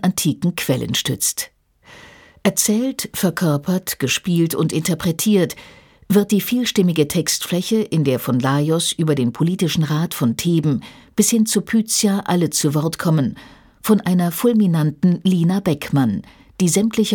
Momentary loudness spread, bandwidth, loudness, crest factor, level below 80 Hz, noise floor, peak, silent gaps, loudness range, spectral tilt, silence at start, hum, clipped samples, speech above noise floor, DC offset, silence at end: 5 LU; 19 kHz; -18 LUFS; 16 dB; -52 dBFS; -46 dBFS; -2 dBFS; none; 2 LU; -5 dB/octave; 0 s; none; under 0.1%; 28 dB; under 0.1%; 0 s